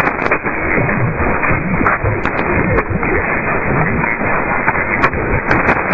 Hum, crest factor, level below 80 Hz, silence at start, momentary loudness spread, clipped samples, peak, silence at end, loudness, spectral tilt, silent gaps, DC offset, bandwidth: none; 14 dB; -28 dBFS; 0 s; 2 LU; under 0.1%; 0 dBFS; 0 s; -15 LUFS; -9 dB/octave; none; under 0.1%; 7.4 kHz